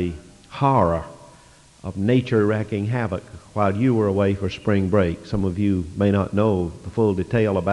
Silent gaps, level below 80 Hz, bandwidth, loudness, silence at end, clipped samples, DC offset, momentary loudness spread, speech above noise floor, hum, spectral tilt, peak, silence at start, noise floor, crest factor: none; -48 dBFS; 11 kHz; -22 LUFS; 0 s; under 0.1%; under 0.1%; 10 LU; 29 dB; none; -8.5 dB/octave; -4 dBFS; 0 s; -50 dBFS; 18 dB